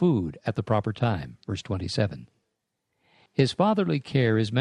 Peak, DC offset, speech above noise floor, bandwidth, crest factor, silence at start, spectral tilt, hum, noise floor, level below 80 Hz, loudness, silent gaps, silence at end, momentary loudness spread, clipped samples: -8 dBFS; under 0.1%; 55 dB; 11 kHz; 18 dB; 0 s; -7 dB/octave; none; -80 dBFS; -56 dBFS; -26 LUFS; none; 0 s; 10 LU; under 0.1%